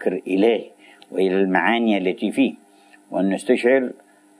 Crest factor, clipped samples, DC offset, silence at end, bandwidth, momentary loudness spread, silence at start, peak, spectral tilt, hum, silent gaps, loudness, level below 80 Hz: 18 dB; under 0.1%; under 0.1%; 0.45 s; 11 kHz; 7 LU; 0 s; -4 dBFS; -6 dB/octave; none; none; -20 LUFS; -78 dBFS